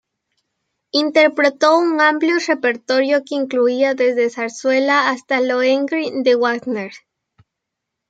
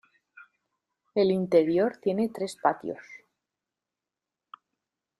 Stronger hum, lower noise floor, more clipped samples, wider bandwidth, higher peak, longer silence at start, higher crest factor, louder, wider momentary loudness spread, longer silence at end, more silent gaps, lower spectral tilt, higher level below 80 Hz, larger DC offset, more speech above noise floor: neither; second, -80 dBFS vs -89 dBFS; neither; second, 9 kHz vs 12.5 kHz; first, -2 dBFS vs -8 dBFS; second, 0.95 s vs 1.15 s; second, 16 dB vs 22 dB; first, -16 LUFS vs -26 LUFS; second, 7 LU vs 13 LU; second, 1.1 s vs 2.05 s; neither; second, -3 dB/octave vs -6.5 dB/octave; about the same, -74 dBFS vs -72 dBFS; neither; about the same, 64 dB vs 64 dB